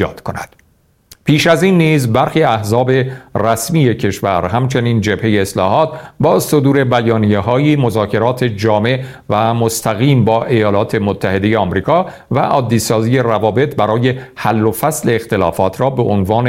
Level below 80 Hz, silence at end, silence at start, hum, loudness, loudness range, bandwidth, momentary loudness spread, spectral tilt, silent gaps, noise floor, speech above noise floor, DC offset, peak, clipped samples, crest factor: -44 dBFS; 0 s; 0 s; none; -14 LUFS; 1 LU; 16.5 kHz; 5 LU; -6 dB/octave; none; -54 dBFS; 41 dB; under 0.1%; 0 dBFS; under 0.1%; 14 dB